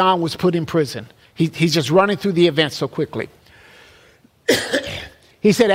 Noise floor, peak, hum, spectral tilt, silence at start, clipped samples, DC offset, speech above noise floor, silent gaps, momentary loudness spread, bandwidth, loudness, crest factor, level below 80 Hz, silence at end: -52 dBFS; -2 dBFS; none; -5 dB/octave; 0 s; under 0.1%; under 0.1%; 35 dB; none; 14 LU; 16 kHz; -19 LUFS; 16 dB; -52 dBFS; 0 s